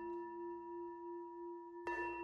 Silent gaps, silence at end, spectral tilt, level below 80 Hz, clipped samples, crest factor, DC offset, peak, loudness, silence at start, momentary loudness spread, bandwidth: none; 0 s; -6 dB/octave; -74 dBFS; under 0.1%; 16 dB; under 0.1%; -30 dBFS; -47 LUFS; 0 s; 7 LU; 7.2 kHz